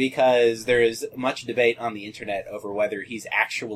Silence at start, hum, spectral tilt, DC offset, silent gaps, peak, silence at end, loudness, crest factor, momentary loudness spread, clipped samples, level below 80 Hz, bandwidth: 0 s; none; -4 dB/octave; under 0.1%; none; -6 dBFS; 0 s; -23 LUFS; 18 dB; 12 LU; under 0.1%; -58 dBFS; 14.5 kHz